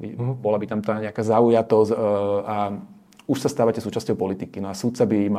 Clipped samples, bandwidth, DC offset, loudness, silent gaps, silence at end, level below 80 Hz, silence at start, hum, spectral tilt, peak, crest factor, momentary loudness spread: under 0.1%; 15 kHz; under 0.1%; -22 LUFS; none; 0 s; -64 dBFS; 0 s; none; -7 dB/octave; -4 dBFS; 18 dB; 11 LU